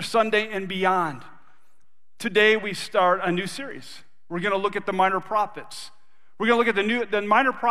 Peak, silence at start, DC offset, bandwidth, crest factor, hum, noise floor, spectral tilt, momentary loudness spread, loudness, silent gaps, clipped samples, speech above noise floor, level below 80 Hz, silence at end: -4 dBFS; 0 s; 0.9%; 14.5 kHz; 20 dB; none; -71 dBFS; -4.5 dB/octave; 18 LU; -23 LUFS; none; under 0.1%; 48 dB; -68 dBFS; 0 s